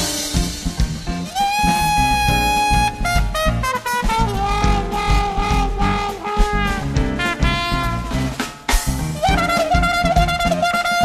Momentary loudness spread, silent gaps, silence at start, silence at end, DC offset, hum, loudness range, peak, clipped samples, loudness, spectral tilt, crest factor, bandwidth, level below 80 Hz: 7 LU; none; 0 s; 0 s; under 0.1%; none; 3 LU; -2 dBFS; under 0.1%; -19 LUFS; -4 dB/octave; 16 dB; 14 kHz; -24 dBFS